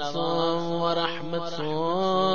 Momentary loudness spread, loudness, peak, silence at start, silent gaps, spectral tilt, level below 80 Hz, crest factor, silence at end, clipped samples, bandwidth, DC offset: 6 LU; -27 LUFS; -8 dBFS; 0 s; none; -6 dB/octave; -64 dBFS; 16 dB; 0 s; under 0.1%; 7.2 kHz; 2%